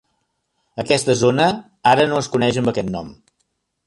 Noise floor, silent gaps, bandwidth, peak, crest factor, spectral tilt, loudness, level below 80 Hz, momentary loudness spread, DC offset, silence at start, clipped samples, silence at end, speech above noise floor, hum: -71 dBFS; none; 11.5 kHz; -2 dBFS; 18 dB; -5 dB/octave; -18 LUFS; -52 dBFS; 15 LU; under 0.1%; 0.75 s; under 0.1%; 0.75 s; 53 dB; none